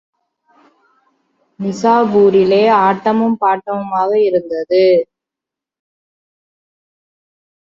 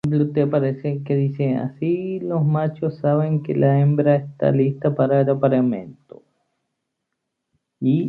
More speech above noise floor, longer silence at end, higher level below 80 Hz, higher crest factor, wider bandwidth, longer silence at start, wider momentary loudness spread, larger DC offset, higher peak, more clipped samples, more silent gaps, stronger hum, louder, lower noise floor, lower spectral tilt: first, 73 dB vs 59 dB; first, 2.7 s vs 0 s; about the same, -62 dBFS vs -62 dBFS; about the same, 14 dB vs 16 dB; first, 7.4 kHz vs 4.4 kHz; first, 1.6 s vs 0.05 s; about the same, 9 LU vs 7 LU; neither; about the same, -2 dBFS vs -4 dBFS; neither; neither; neither; first, -13 LUFS vs -20 LUFS; first, -85 dBFS vs -78 dBFS; second, -6.5 dB/octave vs -11 dB/octave